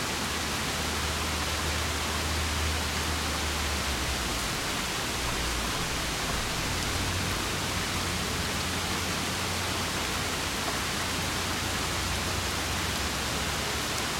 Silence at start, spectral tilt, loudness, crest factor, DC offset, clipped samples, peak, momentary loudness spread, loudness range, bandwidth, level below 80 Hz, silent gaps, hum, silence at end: 0 s; -2.5 dB/octave; -29 LUFS; 20 dB; under 0.1%; under 0.1%; -10 dBFS; 1 LU; 0 LU; 16.5 kHz; -40 dBFS; none; none; 0 s